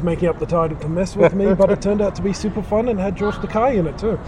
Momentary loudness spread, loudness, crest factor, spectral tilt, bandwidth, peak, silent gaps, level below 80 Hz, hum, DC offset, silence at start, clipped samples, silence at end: 7 LU; -19 LUFS; 16 dB; -7.5 dB/octave; 11 kHz; -2 dBFS; none; -34 dBFS; none; under 0.1%; 0 s; under 0.1%; 0 s